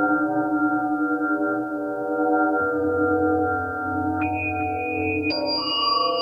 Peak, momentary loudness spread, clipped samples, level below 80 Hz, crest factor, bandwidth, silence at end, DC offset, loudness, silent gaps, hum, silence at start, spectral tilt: -10 dBFS; 5 LU; under 0.1%; -54 dBFS; 14 dB; 5.2 kHz; 0 s; under 0.1%; -23 LUFS; none; none; 0 s; -7 dB/octave